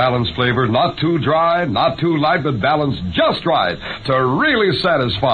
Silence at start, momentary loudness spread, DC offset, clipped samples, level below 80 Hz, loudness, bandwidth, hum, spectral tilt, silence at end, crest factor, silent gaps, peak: 0 s; 3 LU; under 0.1%; under 0.1%; -42 dBFS; -16 LUFS; 9.4 kHz; none; -7.5 dB/octave; 0 s; 14 dB; none; -2 dBFS